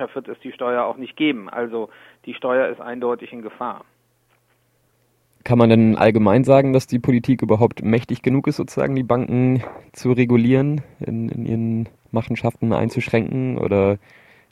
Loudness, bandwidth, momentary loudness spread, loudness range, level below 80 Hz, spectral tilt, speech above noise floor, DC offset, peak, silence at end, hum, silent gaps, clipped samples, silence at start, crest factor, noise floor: -19 LUFS; 12.5 kHz; 15 LU; 10 LU; -52 dBFS; -8 dB/octave; 44 dB; under 0.1%; 0 dBFS; 0.55 s; none; none; under 0.1%; 0 s; 20 dB; -63 dBFS